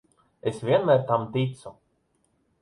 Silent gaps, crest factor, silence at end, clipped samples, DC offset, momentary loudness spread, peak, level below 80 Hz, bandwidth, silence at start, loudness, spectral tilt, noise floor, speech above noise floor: none; 20 dB; 0.9 s; under 0.1%; under 0.1%; 17 LU; -8 dBFS; -64 dBFS; 11 kHz; 0.45 s; -25 LUFS; -7.5 dB/octave; -70 dBFS; 46 dB